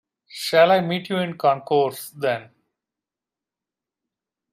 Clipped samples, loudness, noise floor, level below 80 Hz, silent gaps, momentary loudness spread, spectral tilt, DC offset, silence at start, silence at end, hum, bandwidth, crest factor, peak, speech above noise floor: under 0.1%; -21 LUFS; -89 dBFS; -72 dBFS; none; 13 LU; -5 dB/octave; under 0.1%; 0.35 s; 2.1 s; none; 16 kHz; 20 dB; -4 dBFS; 68 dB